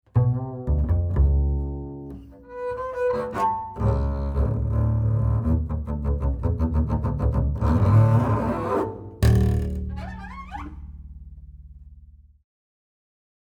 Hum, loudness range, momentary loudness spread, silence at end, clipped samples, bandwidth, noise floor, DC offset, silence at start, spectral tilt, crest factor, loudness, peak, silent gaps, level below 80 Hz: none; 11 LU; 17 LU; 1.55 s; under 0.1%; 10.5 kHz; -49 dBFS; under 0.1%; 0.15 s; -9 dB/octave; 16 dB; -24 LUFS; -8 dBFS; none; -30 dBFS